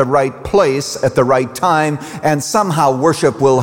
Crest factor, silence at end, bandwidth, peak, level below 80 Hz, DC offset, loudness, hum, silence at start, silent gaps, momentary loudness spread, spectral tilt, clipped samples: 12 dB; 0 s; 17 kHz; -2 dBFS; -46 dBFS; 0.2%; -14 LUFS; none; 0 s; none; 4 LU; -5 dB/octave; under 0.1%